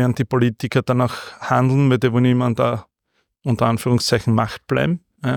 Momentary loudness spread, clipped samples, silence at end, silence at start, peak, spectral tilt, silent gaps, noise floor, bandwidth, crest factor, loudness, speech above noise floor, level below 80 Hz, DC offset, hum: 7 LU; under 0.1%; 0 s; 0 s; -4 dBFS; -6.5 dB/octave; none; -70 dBFS; 17.5 kHz; 16 dB; -19 LUFS; 52 dB; -50 dBFS; under 0.1%; none